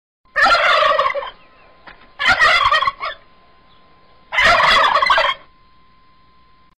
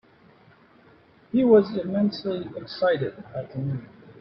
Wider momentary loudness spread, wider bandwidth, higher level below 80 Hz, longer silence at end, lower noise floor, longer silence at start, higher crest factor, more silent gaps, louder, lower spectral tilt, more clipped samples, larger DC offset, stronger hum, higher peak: about the same, 15 LU vs 16 LU; first, 15 kHz vs 6 kHz; first, -44 dBFS vs -62 dBFS; first, 1.45 s vs 0.1 s; about the same, -53 dBFS vs -55 dBFS; second, 0.35 s vs 1.35 s; second, 14 dB vs 20 dB; neither; first, -14 LUFS vs -24 LUFS; second, -1.5 dB/octave vs -9 dB/octave; neither; first, 0.3% vs under 0.1%; neither; about the same, -4 dBFS vs -6 dBFS